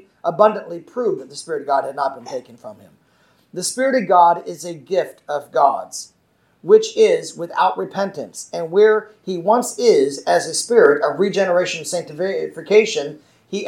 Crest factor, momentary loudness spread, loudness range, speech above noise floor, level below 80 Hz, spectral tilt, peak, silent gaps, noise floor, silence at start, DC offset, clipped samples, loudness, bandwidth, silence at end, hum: 18 dB; 16 LU; 5 LU; 40 dB; -76 dBFS; -3.5 dB/octave; 0 dBFS; none; -58 dBFS; 0.25 s; under 0.1%; under 0.1%; -18 LUFS; 15.5 kHz; 0 s; none